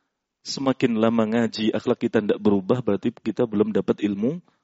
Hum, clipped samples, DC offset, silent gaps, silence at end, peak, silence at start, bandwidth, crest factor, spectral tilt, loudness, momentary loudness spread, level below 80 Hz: none; under 0.1%; under 0.1%; none; 0.25 s; -6 dBFS; 0.45 s; 8 kHz; 18 dB; -5.5 dB/octave; -23 LUFS; 6 LU; -62 dBFS